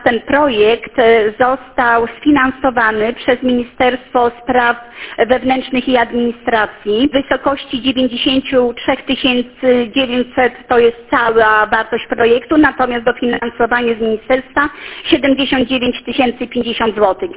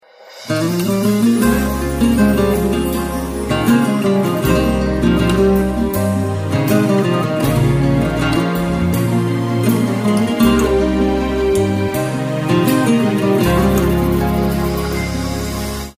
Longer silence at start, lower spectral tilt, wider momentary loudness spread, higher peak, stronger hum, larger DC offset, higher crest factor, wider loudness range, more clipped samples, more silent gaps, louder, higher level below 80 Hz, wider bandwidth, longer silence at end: second, 0 s vs 0.2 s; first, -8 dB/octave vs -6.5 dB/octave; about the same, 6 LU vs 6 LU; about the same, 0 dBFS vs -2 dBFS; neither; neither; about the same, 14 dB vs 14 dB; about the same, 2 LU vs 1 LU; neither; neither; about the same, -14 LUFS vs -16 LUFS; second, -42 dBFS vs -28 dBFS; second, 4 kHz vs 16 kHz; about the same, 0 s vs 0.05 s